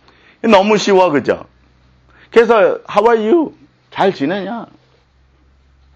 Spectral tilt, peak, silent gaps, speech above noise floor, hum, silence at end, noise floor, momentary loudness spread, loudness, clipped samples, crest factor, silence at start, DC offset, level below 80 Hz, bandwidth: -5 dB/octave; 0 dBFS; none; 40 dB; none; 1.3 s; -53 dBFS; 13 LU; -13 LUFS; under 0.1%; 16 dB; 0.45 s; under 0.1%; -52 dBFS; 8.4 kHz